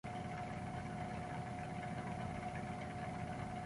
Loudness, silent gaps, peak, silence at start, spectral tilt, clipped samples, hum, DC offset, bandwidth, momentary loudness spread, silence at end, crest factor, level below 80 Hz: -45 LUFS; none; -32 dBFS; 0.05 s; -6.5 dB/octave; under 0.1%; none; under 0.1%; 11.5 kHz; 1 LU; 0 s; 12 dB; -58 dBFS